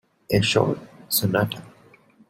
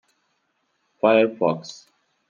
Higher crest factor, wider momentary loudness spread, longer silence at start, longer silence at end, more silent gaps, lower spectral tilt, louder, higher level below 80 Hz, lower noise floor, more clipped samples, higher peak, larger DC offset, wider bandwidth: about the same, 22 dB vs 20 dB; second, 11 LU vs 15 LU; second, 0.3 s vs 1.05 s; about the same, 0.6 s vs 0.55 s; neither; second, -4.5 dB/octave vs -6 dB/octave; about the same, -23 LUFS vs -21 LUFS; first, -52 dBFS vs -78 dBFS; second, -54 dBFS vs -71 dBFS; neither; about the same, -4 dBFS vs -4 dBFS; neither; first, 16.5 kHz vs 7.4 kHz